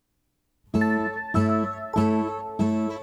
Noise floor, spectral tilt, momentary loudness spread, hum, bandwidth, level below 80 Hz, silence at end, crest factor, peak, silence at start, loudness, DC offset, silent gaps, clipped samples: -74 dBFS; -8 dB/octave; 4 LU; none; 11 kHz; -50 dBFS; 0 s; 16 dB; -10 dBFS; 0.75 s; -25 LUFS; under 0.1%; none; under 0.1%